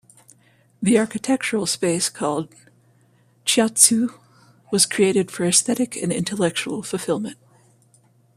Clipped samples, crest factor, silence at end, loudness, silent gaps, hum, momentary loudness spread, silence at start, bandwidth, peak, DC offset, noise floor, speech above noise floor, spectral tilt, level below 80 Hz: under 0.1%; 22 dB; 1.05 s; -20 LUFS; none; none; 12 LU; 0.8 s; 15 kHz; 0 dBFS; under 0.1%; -58 dBFS; 37 dB; -3 dB/octave; -64 dBFS